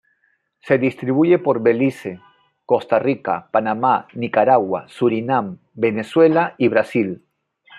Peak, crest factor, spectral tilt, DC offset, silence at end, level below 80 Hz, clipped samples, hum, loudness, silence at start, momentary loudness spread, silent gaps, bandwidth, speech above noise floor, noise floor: -2 dBFS; 18 dB; -8 dB/octave; under 0.1%; 0 s; -68 dBFS; under 0.1%; none; -18 LUFS; 0.65 s; 8 LU; none; 11.5 kHz; 48 dB; -65 dBFS